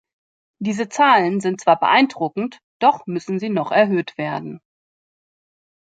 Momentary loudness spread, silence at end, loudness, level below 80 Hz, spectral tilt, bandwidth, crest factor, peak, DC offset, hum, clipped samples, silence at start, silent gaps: 13 LU; 1.3 s; -19 LUFS; -70 dBFS; -5 dB/octave; 9.2 kHz; 20 dB; -2 dBFS; under 0.1%; none; under 0.1%; 0.6 s; 2.63-2.80 s